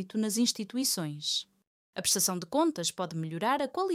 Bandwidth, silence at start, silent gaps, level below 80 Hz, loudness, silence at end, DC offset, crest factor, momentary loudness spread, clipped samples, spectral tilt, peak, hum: 17 kHz; 0 s; 1.67-1.93 s; -74 dBFS; -30 LUFS; 0 s; under 0.1%; 16 dB; 6 LU; under 0.1%; -3 dB/octave; -14 dBFS; none